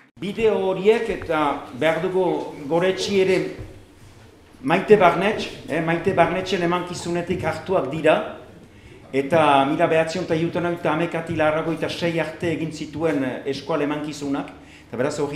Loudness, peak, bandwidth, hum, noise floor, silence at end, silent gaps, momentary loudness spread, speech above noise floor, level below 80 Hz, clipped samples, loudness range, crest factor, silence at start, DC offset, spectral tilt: -22 LUFS; 0 dBFS; 14 kHz; none; -47 dBFS; 0 s; none; 10 LU; 26 dB; -52 dBFS; under 0.1%; 4 LU; 20 dB; 0.15 s; under 0.1%; -6 dB/octave